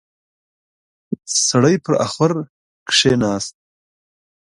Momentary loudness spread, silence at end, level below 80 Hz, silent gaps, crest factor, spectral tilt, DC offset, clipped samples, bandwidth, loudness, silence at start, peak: 16 LU; 1.1 s; -54 dBFS; 2.50-2.86 s; 20 dB; -3.5 dB/octave; under 0.1%; under 0.1%; 11.5 kHz; -17 LUFS; 1.1 s; 0 dBFS